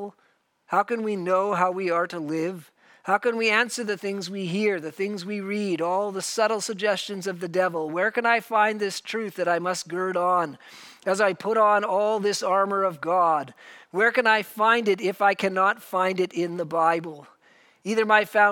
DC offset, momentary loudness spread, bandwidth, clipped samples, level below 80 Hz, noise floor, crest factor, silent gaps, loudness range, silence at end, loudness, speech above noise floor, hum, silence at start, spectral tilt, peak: under 0.1%; 10 LU; 18 kHz; under 0.1%; -82 dBFS; -66 dBFS; 20 dB; none; 4 LU; 0 s; -24 LUFS; 42 dB; none; 0 s; -4 dB/octave; -4 dBFS